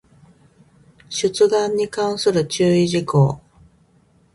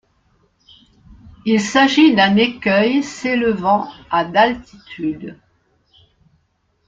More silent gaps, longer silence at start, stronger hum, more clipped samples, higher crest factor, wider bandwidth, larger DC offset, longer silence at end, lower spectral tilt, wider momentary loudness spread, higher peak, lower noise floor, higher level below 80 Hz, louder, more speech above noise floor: neither; second, 1.1 s vs 1.25 s; neither; neither; about the same, 18 dB vs 18 dB; first, 11.5 kHz vs 7.8 kHz; neither; second, 0.95 s vs 1.55 s; about the same, -5.5 dB/octave vs -5 dB/octave; second, 6 LU vs 15 LU; about the same, -2 dBFS vs -2 dBFS; second, -57 dBFS vs -64 dBFS; about the same, -54 dBFS vs -52 dBFS; second, -19 LUFS vs -16 LUFS; second, 39 dB vs 49 dB